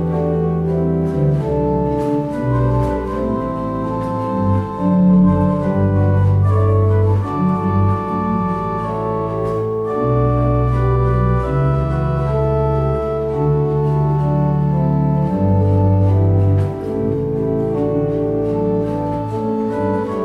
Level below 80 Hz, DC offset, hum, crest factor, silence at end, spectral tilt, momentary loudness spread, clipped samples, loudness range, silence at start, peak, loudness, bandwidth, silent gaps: -30 dBFS; under 0.1%; none; 12 dB; 0 s; -10.5 dB/octave; 6 LU; under 0.1%; 4 LU; 0 s; -4 dBFS; -17 LUFS; 5 kHz; none